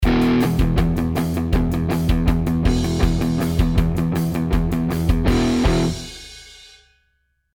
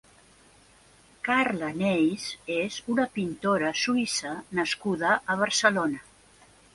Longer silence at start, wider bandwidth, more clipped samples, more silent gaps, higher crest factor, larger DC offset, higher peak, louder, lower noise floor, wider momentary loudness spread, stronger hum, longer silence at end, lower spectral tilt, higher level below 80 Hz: second, 0 s vs 1.25 s; first, 19 kHz vs 11.5 kHz; neither; neither; second, 16 dB vs 22 dB; neither; first, -2 dBFS vs -6 dBFS; first, -20 LUFS vs -26 LUFS; first, -67 dBFS vs -57 dBFS; second, 4 LU vs 8 LU; neither; first, 1 s vs 0.75 s; first, -7 dB/octave vs -3.5 dB/octave; first, -24 dBFS vs -64 dBFS